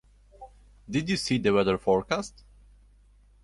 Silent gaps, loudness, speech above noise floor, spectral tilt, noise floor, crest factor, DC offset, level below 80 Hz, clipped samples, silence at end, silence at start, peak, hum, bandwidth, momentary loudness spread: none; -26 LUFS; 32 dB; -5 dB/octave; -58 dBFS; 18 dB; under 0.1%; -52 dBFS; under 0.1%; 1.15 s; 0.4 s; -10 dBFS; 50 Hz at -45 dBFS; 11.5 kHz; 8 LU